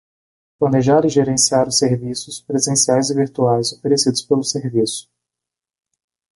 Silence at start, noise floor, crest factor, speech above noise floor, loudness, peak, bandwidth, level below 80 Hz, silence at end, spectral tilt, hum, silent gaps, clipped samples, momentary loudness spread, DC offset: 0.6 s; -87 dBFS; 16 dB; 71 dB; -17 LUFS; -2 dBFS; 11.5 kHz; -54 dBFS; 1.35 s; -4 dB/octave; none; none; under 0.1%; 8 LU; under 0.1%